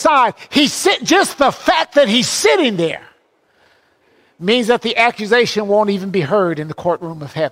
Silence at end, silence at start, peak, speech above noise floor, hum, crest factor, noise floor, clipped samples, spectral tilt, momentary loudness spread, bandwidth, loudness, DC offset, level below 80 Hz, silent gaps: 0 s; 0 s; 0 dBFS; 42 dB; none; 14 dB; -57 dBFS; under 0.1%; -3.5 dB/octave; 9 LU; 16 kHz; -15 LUFS; under 0.1%; -56 dBFS; none